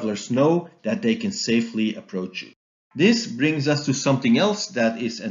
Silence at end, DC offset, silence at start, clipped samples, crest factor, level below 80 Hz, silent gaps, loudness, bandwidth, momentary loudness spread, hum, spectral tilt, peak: 0 s; under 0.1%; 0 s; under 0.1%; 16 dB; -72 dBFS; 2.56-2.91 s; -22 LUFS; 7.6 kHz; 11 LU; none; -5 dB/octave; -6 dBFS